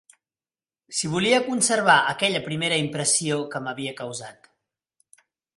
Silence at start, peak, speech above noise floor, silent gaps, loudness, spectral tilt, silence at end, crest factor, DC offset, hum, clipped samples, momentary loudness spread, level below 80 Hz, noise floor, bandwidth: 0.9 s; -4 dBFS; over 67 dB; none; -22 LUFS; -2.5 dB/octave; 1.25 s; 22 dB; under 0.1%; none; under 0.1%; 14 LU; -66 dBFS; under -90 dBFS; 11.5 kHz